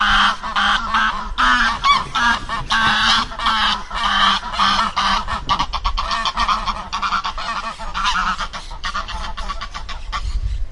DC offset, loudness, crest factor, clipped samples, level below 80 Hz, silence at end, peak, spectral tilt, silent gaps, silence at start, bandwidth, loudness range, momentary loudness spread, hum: under 0.1%; -18 LUFS; 16 dB; under 0.1%; -30 dBFS; 0 s; -2 dBFS; -2 dB/octave; none; 0 s; 11.5 kHz; 7 LU; 13 LU; none